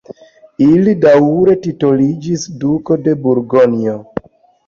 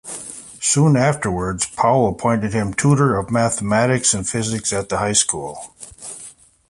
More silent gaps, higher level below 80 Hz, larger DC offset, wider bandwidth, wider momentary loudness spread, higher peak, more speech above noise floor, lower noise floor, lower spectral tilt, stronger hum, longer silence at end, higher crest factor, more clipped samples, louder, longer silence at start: neither; second, -50 dBFS vs -44 dBFS; neither; second, 7.4 kHz vs 11.5 kHz; second, 11 LU vs 17 LU; about the same, -2 dBFS vs -2 dBFS; about the same, 26 dB vs 24 dB; second, -37 dBFS vs -42 dBFS; first, -7.5 dB/octave vs -4.5 dB/octave; neither; about the same, 0.45 s vs 0.4 s; second, 12 dB vs 18 dB; neither; first, -12 LUFS vs -18 LUFS; about the same, 0.1 s vs 0.05 s